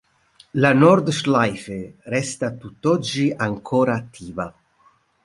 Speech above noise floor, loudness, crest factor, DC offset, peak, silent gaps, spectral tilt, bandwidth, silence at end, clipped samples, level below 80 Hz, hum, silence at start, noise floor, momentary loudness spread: 39 dB; -20 LUFS; 20 dB; under 0.1%; -2 dBFS; none; -6 dB/octave; 11.5 kHz; 0.75 s; under 0.1%; -56 dBFS; none; 0.55 s; -59 dBFS; 17 LU